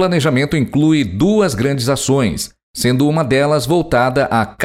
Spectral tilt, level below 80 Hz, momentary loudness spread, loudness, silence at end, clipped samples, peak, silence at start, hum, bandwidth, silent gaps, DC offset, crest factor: -5.5 dB/octave; -40 dBFS; 3 LU; -15 LUFS; 0 s; under 0.1%; -2 dBFS; 0 s; none; 16.5 kHz; 2.63-2.74 s; under 0.1%; 12 dB